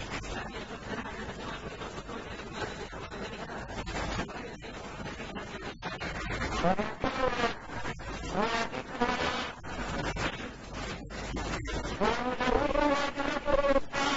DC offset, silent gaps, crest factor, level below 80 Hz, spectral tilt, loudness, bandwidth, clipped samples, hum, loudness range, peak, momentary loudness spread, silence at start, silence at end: under 0.1%; none; 20 dB; -44 dBFS; -4.5 dB/octave; -34 LUFS; 8 kHz; under 0.1%; none; 7 LU; -12 dBFS; 12 LU; 0 s; 0 s